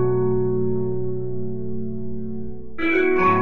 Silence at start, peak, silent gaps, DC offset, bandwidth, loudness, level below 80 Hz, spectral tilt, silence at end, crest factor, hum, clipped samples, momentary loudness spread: 0 s; -6 dBFS; none; 6%; 5.4 kHz; -23 LUFS; -44 dBFS; -9.5 dB/octave; 0 s; 16 dB; none; under 0.1%; 13 LU